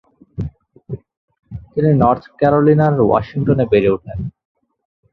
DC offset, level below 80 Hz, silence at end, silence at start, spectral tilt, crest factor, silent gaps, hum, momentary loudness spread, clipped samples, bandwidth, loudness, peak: under 0.1%; -40 dBFS; 0.8 s; 0.4 s; -11 dB/octave; 16 dB; 1.17-1.28 s, 1.39-1.43 s; none; 19 LU; under 0.1%; 5.4 kHz; -15 LUFS; -2 dBFS